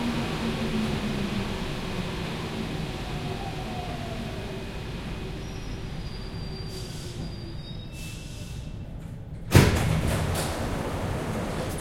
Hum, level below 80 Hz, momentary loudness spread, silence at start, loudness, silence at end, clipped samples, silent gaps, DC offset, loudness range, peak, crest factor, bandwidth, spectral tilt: none; -38 dBFS; 12 LU; 0 s; -30 LUFS; 0 s; under 0.1%; none; under 0.1%; 10 LU; -2 dBFS; 26 dB; 16.5 kHz; -5.5 dB/octave